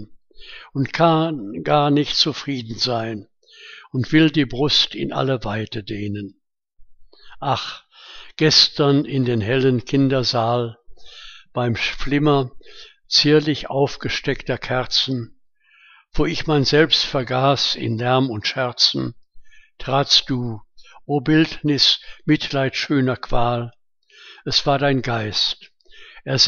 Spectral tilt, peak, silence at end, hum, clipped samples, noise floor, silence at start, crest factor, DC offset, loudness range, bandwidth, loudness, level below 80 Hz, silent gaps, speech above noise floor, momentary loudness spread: -5 dB/octave; 0 dBFS; 0 s; none; under 0.1%; -55 dBFS; 0 s; 20 dB; under 0.1%; 4 LU; 7.2 kHz; -19 LUFS; -40 dBFS; none; 36 dB; 16 LU